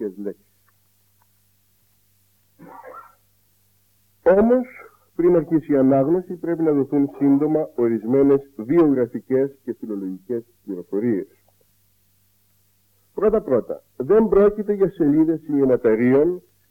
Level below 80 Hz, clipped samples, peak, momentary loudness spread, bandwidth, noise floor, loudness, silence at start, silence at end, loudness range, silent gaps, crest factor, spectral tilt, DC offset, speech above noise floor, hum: -50 dBFS; under 0.1%; -6 dBFS; 17 LU; 16.5 kHz; -63 dBFS; -20 LUFS; 0 s; 0.3 s; 9 LU; none; 16 dB; -10.5 dB/octave; under 0.1%; 44 dB; 50 Hz at -60 dBFS